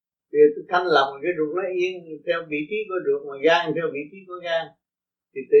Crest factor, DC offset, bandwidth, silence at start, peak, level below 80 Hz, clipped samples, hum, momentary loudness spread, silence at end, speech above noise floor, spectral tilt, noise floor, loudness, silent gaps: 18 dB; under 0.1%; 6.6 kHz; 0.35 s; -4 dBFS; -78 dBFS; under 0.1%; none; 16 LU; 0 s; over 67 dB; -5.5 dB/octave; under -90 dBFS; -23 LUFS; none